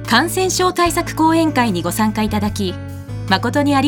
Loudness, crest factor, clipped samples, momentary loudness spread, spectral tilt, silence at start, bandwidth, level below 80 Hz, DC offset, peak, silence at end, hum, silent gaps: -17 LUFS; 16 dB; under 0.1%; 9 LU; -4.5 dB/octave; 0 s; 19.5 kHz; -38 dBFS; under 0.1%; 0 dBFS; 0 s; none; none